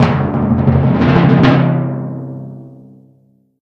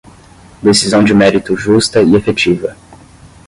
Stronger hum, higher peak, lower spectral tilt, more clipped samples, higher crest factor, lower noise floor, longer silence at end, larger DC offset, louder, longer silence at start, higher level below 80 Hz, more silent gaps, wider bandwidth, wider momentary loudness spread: first, 50 Hz at -35 dBFS vs none; about the same, 0 dBFS vs 0 dBFS; first, -9 dB/octave vs -4.5 dB/octave; neither; about the same, 14 dB vs 12 dB; first, -52 dBFS vs -39 dBFS; first, 0.9 s vs 0.55 s; neither; about the same, -12 LUFS vs -11 LUFS; second, 0 s vs 0.6 s; about the same, -36 dBFS vs -40 dBFS; neither; second, 6.2 kHz vs 11.5 kHz; first, 18 LU vs 7 LU